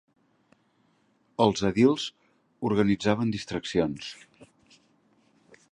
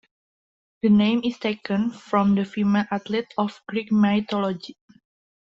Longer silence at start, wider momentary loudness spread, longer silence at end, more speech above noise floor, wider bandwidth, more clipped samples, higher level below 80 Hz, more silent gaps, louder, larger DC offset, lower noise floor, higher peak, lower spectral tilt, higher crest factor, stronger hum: first, 1.4 s vs 0.85 s; first, 16 LU vs 9 LU; first, 1.3 s vs 0.85 s; second, 42 dB vs over 68 dB; first, 10.5 kHz vs 7.2 kHz; neither; about the same, -58 dBFS vs -62 dBFS; neither; second, -26 LUFS vs -23 LUFS; neither; second, -68 dBFS vs under -90 dBFS; about the same, -8 dBFS vs -8 dBFS; second, -6 dB/octave vs -7.5 dB/octave; first, 22 dB vs 16 dB; neither